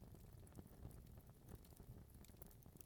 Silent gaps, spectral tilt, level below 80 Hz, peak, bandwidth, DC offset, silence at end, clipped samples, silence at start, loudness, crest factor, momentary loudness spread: none; -6 dB/octave; -66 dBFS; -34 dBFS; over 20 kHz; under 0.1%; 0 s; under 0.1%; 0 s; -62 LUFS; 28 dB; 3 LU